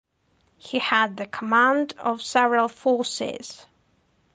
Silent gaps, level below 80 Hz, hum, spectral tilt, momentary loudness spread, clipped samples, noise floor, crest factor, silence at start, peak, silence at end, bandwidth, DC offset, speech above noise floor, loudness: none; -70 dBFS; none; -3 dB/octave; 12 LU; under 0.1%; -66 dBFS; 18 dB; 0.65 s; -6 dBFS; 0.8 s; 9.8 kHz; under 0.1%; 43 dB; -23 LUFS